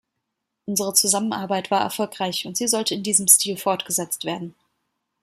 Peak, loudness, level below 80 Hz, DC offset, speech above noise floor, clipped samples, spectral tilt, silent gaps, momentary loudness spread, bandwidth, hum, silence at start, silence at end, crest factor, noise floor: 0 dBFS; -20 LUFS; -70 dBFS; under 0.1%; 57 dB; under 0.1%; -2 dB/octave; none; 12 LU; 16 kHz; none; 0.65 s; 0.7 s; 24 dB; -79 dBFS